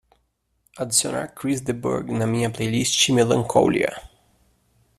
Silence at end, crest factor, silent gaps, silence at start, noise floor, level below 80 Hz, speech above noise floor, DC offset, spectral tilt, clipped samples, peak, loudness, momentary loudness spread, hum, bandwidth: 0.9 s; 20 dB; none; 0.75 s; -70 dBFS; -54 dBFS; 48 dB; under 0.1%; -4 dB/octave; under 0.1%; -2 dBFS; -21 LUFS; 10 LU; none; 14.5 kHz